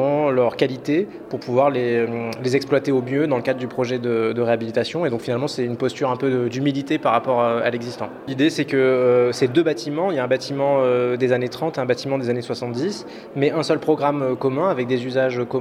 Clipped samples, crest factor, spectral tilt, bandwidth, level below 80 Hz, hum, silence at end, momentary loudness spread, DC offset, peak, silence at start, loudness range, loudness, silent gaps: under 0.1%; 18 dB; -6.5 dB/octave; 14 kHz; -64 dBFS; none; 0 s; 6 LU; under 0.1%; -2 dBFS; 0 s; 3 LU; -21 LUFS; none